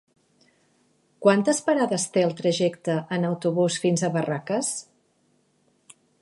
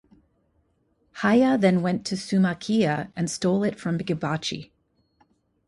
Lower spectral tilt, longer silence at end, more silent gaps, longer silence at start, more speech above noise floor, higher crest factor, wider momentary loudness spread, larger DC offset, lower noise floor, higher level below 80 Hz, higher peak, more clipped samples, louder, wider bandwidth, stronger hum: about the same, -5 dB/octave vs -6 dB/octave; first, 1.4 s vs 1.05 s; neither; about the same, 1.2 s vs 1.15 s; about the same, 43 dB vs 45 dB; about the same, 22 dB vs 18 dB; second, 6 LU vs 9 LU; neither; about the same, -66 dBFS vs -68 dBFS; second, -74 dBFS vs -62 dBFS; about the same, -4 dBFS vs -6 dBFS; neither; about the same, -24 LUFS vs -24 LUFS; about the same, 11.5 kHz vs 11.5 kHz; neither